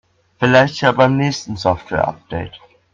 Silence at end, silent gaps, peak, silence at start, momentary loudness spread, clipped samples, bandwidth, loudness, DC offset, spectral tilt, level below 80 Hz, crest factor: 0.35 s; none; 0 dBFS; 0.4 s; 15 LU; under 0.1%; 7.6 kHz; -16 LUFS; under 0.1%; -6 dB/octave; -46 dBFS; 16 dB